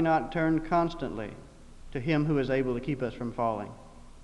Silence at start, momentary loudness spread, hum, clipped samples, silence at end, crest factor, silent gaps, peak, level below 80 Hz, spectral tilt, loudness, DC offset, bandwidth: 0 s; 13 LU; none; under 0.1%; 0 s; 16 dB; none; -14 dBFS; -48 dBFS; -8 dB/octave; -30 LUFS; under 0.1%; 11 kHz